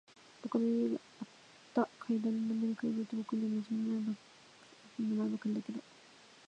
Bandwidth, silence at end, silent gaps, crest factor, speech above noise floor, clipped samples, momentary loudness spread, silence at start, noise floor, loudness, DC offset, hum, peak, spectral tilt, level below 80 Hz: 8.6 kHz; 0.65 s; none; 20 dB; 25 dB; under 0.1%; 14 LU; 0.45 s; -60 dBFS; -36 LUFS; under 0.1%; none; -18 dBFS; -7 dB/octave; -88 dBFS